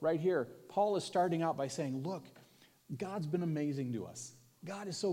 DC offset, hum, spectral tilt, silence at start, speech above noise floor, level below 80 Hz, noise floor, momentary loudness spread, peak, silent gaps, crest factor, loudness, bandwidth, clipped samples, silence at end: under 0.1%; none; -6 dB/octave; 0 s; 28 dB; -86 dBFS; -64 dBFS; 14 LU; -20 dBFS; none; 16 dB; -37 LUFS; 16.5 kHz; under 0.1%; 0 s